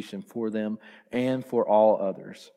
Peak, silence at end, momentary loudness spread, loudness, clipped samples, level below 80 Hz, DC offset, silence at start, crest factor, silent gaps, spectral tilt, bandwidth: -10 dBFS; 0.1 s; 16 LU; -26 LUFS; under 0.1%; -76 dBFS; under 0.1%; 0 s; 18 dB; none; -7 dB/octave; 13 kHz